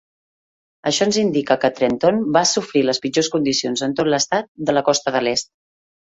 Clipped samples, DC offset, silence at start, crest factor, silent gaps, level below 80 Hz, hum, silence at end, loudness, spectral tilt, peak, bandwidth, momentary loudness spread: under 0.1%; under 0.1%; 0.85 s; 18 dB; 4.48-4.55 s; -60 dBFS; none; 0.7 s; -18 LUFS; -3.5 dB/octave; -2 dBFS; 8.2 kHz; 5 LU